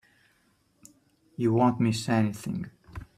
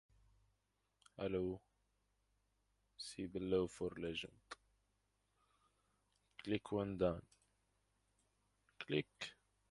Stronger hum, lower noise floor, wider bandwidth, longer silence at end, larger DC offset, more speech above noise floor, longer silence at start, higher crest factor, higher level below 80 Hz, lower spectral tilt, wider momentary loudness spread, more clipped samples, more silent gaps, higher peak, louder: neither; second, -68 dBFS vs -85 dBFS; first, 14 kHz vs 11.5 kHz; second, 0.15 s vs 0.35 s; neither; about the same, 42 dB vs 42 dB; first, 1.4 s vs 1.2 s; second, 18 dB vs 24 dB; first, -58 dBFS vs -68 dBFS; about the same, -6.5 dB/octave vs -6 dB/octave; about the same, 19 LU vs 17 LU; neither; neither; first, -10 dBFS vs -24 dBFS; first, -27 LUFS vs -44 LUFS